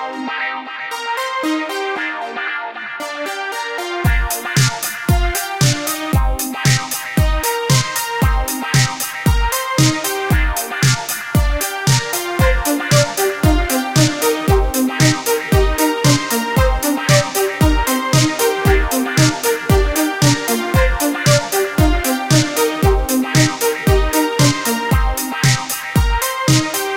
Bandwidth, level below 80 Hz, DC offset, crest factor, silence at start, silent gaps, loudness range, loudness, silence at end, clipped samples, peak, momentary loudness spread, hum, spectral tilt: 17 kHz; -24 dBFS; under 0.1%; 14 dB; 0 s; none; 4 LU; -16 LUFS; 0 s; under 0.1%; -2 dBFS; 7 LU; none; -4 dB/octave